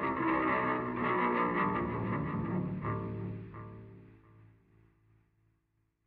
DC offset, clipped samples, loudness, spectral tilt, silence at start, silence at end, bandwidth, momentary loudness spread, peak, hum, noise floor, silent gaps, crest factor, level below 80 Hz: under 0.1%; under 0.1%; -33 LUFS; -6 dB/octave; 0 s; 1.6 s; 4.9 kHz; 17 LU; -18 dBFS; none; -77 dBFS; none; 16 dB; -58 dBFS